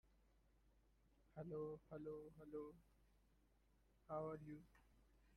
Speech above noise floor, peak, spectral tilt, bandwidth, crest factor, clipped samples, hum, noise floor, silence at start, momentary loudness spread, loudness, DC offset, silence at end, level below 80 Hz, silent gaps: 25 dB; -38 dBFS; -9 dB/octave; 11.5 kHz; 20 dB; under 0.1%; none; -78 dBFS; 0.05 s; 10 LU; -55 LUFS; under 0.1%; 0 s; -76 dBFS; none